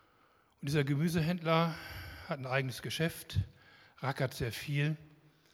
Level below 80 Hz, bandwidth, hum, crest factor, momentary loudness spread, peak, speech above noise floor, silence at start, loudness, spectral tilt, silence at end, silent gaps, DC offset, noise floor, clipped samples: -58 dBFS; 16.5 kHz; none; 22 dB; 13 LU; -14 dBFS; 35 dB; 0.6 s; -35 LUFS; -6 dB/octave; 0.45 s; none; under 0.1%; -68 dBFS; under 0.1%